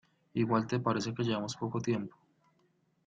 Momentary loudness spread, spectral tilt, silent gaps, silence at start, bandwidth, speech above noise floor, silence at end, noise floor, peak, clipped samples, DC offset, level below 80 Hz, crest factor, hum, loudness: 6 LU; -6 dB/octave; none; 0.35 s; 9 kHz; 40 dB; 0.95 s; -73 dBFS; -14 dBFS; under 0.1%; under 0.1%; -70 dBFS; 20 dB; none; -33 LUFS